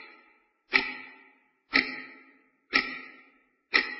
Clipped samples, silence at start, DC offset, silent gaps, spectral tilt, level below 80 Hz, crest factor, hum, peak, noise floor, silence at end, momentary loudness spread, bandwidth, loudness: under 0.1%; 0 s; under 0.1%; none; -4.5 dB/octave; -66 dBFS; 28 dB; none; -6 dBFS; -64 dBFS; 0 s; 22 LU; 6 kHz; -27 LUFS